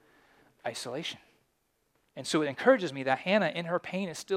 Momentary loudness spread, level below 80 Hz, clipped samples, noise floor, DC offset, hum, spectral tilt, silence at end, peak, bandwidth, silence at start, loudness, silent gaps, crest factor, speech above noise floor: 15 LU; -78 dBFS; under 0.1%; -75 dBFS; under 0.1%; none; -4.5 dB/octave; 0 s; -8 dBFS; 15 kHz; 0.65 s; -30 LUFS; none; 24 dB; 46 dB